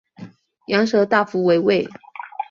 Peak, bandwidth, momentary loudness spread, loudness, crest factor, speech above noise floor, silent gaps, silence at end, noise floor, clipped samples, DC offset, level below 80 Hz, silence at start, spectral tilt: -2 dBFS; 7.4 kHz; 15 LU; -18 LUFS; 18 dB; 24 dB; none; 0.05 s; -41 dBFS; under 0.1%; under 0.1%; -64 dBFS; 0.2 s; -6 dB/octave